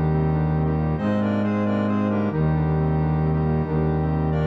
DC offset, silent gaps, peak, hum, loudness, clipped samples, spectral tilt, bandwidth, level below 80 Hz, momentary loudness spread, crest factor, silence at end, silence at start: under 0.1%; none; -10 dBFS; none; -22 LUFS; under 0.1%; -10.5 dB/octave; 5 kHz; -34 dBFS; 1 LU; 10 dB; 0 s; 0 s